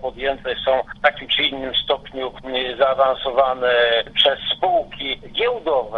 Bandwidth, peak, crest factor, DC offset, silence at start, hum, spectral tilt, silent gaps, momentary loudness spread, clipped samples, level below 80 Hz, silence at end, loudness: 6.8 kHz; -2 dBFS; 18 dB; under 0.1%; 0 s; none; -4.5 dB/octave; none; 8 LU; under 0.1%; -46 dBFS; 0 s; -19 LUFS